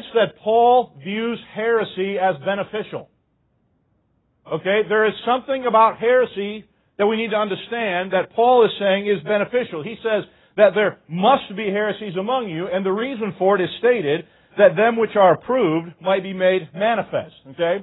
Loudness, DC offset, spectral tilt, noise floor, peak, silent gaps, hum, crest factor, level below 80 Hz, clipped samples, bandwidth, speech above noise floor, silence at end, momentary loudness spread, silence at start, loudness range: -20 LUFS; under 0.1%; -10.5 dB/octave; -66 dBFS; 0 dBFS; none; none; 18 dB; -62 dBFS; under 0.1%; 4.1 kHz; 47 dB; 0 s; 11 LU; 0 s; 5 LU